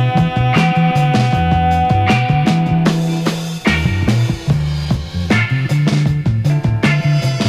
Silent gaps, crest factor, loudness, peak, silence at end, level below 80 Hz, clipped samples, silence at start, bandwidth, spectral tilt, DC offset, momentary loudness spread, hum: none; 14 dB; -15 LUFS; 0 dBFS; 0 s; -30 dBFS; under 0.1%; 0 s; 13.5 kHz; -6.5 dB/octave; under 0.1%; 4 LU; none